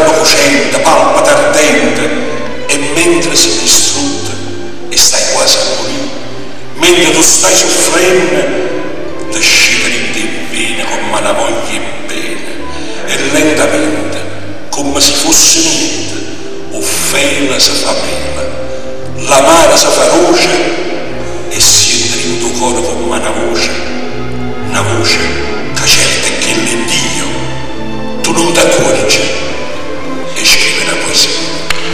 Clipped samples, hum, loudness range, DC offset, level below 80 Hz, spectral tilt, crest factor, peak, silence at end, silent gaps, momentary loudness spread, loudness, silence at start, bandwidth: 0.7%; none; 5 LU; 20%; -34 dBFS; -2 dB/octave; 12 dB; 0 dBFS; 0 s; none; 15 LU; -9 LUFS; 0 s; over 20 kHz